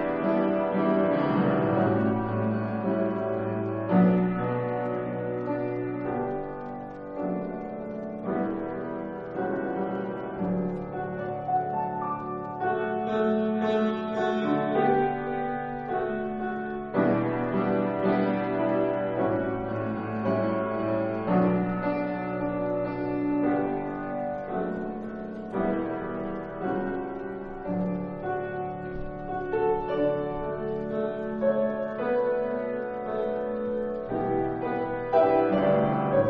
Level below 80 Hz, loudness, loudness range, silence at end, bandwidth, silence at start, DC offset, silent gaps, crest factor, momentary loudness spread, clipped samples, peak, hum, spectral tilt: -52 dBFS; -28 LUFS; 6 LU; 0 s; 5.8 kHz; 0 s; under 0.1%; none; 18 dB; 9 LU; under 0.1%; -10 dBFS; none; -7 dB/octave